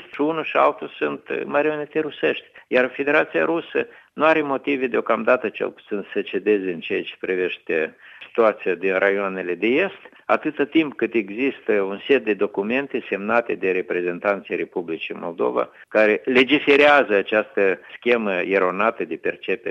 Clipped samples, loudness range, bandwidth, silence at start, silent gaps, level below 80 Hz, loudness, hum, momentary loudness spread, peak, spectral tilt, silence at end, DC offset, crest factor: under 0.1%; 5 LU; 7 kHz; 0 s; none; -70 dBFS; -21 LUFS; none; 9 LU; -2 dBFS; -6.5 dB/octave; 0 s; under 0.1%; 20 dB